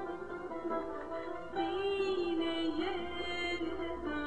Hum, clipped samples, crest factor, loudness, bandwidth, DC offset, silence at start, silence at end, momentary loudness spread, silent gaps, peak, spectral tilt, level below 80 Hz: none; under 0.1%; 12 dB; -37 LUFS; 9.4 kHz; 0.3%; 0 s; 0 s; 8 LU; none; -24 dBFS; -5 dB/octave; -58 dBFS